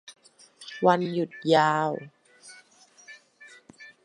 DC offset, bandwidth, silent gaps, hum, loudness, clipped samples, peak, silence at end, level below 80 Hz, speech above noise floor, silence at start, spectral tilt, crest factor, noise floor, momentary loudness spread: under 0.1%; 11.5 kHz; none; none; -24 LUFS; under 0.1%; -6 dBFS; 0.15 s; -78 dBFS; 33 dB; 0.1 s; -5.5 dB/octave; 24 dB; -56 dBFS; 27 LU